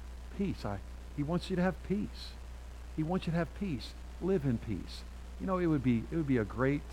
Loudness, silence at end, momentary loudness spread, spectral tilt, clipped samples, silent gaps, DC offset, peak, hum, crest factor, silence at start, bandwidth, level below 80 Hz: -35 LUFS; 0 s; 15 LU; -7.5 dB/octave; under 0.1%; none; under 0.1%; -16 dBFS; none; 18 dB; 0 s; 15.5 kHz; -46 dBFS